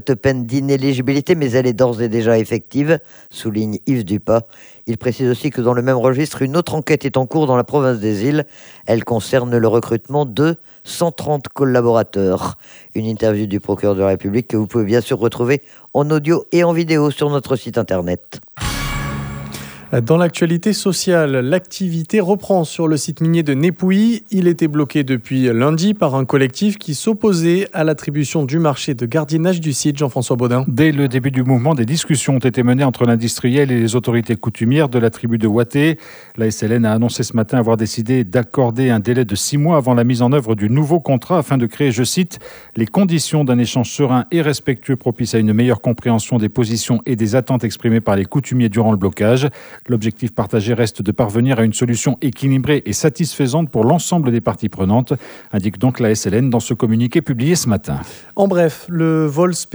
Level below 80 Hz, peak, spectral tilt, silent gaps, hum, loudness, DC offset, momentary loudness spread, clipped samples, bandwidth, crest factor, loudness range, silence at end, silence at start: -46 dBFS; 0 dBFS; -6 dB/octave; none; none; -16 LUFS; under 0.1%; 7 LU; under 0.1%; over 20 kHz; 16 dB; 3 LU; 0.1 s; 0.05 s